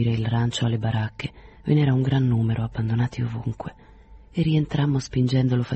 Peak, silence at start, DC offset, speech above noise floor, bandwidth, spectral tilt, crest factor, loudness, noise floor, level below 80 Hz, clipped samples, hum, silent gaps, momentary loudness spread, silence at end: -10 dBFS; 0 s; under 0.1%; 25 dB; 8.4 kHz; -7.5 dB/octave; 14 dB; -24 LUFS; -47 dBFS; -46 dBFS; under 0.1%; none; none; 12 LU; 0 s